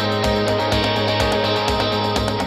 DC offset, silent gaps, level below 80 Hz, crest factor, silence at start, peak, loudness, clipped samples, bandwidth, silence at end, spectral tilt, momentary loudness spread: under 0.1%; none; -34 dBFS; 14 dB; 0 s; -4 dBFS; -19 LUFS; under 0.1%; 15 kHz; 0 s; -5 dB/octave; 1 LU